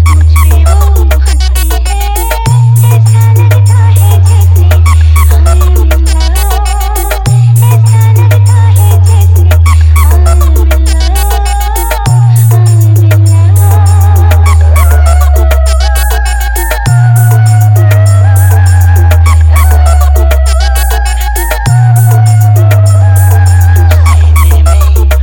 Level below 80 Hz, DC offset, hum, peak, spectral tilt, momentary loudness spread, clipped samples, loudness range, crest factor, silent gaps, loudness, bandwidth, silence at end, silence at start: -8 dBFS; under 0.1%; none; 0 dBFS; -5.5 dB/octave; 5 LU; 10%; 2 LU; 4 dB; none; -6 LUFS; 20 kHz; 0 s; 0 s